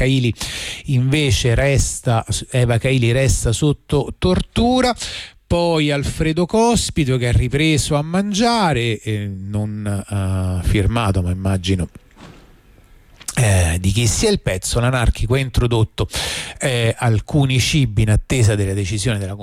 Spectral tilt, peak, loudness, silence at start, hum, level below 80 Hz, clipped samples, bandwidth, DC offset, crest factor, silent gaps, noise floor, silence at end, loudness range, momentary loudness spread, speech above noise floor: -5 dB/octave; -6 dBFS; -18 LUFS; 0 s; none; -30 dBFS; under 0.1%; 15.5 kHz; under 0.1%; 12 dB; none; -47 dBFS; 0 s; 4 LU; 7 LU; 30 dB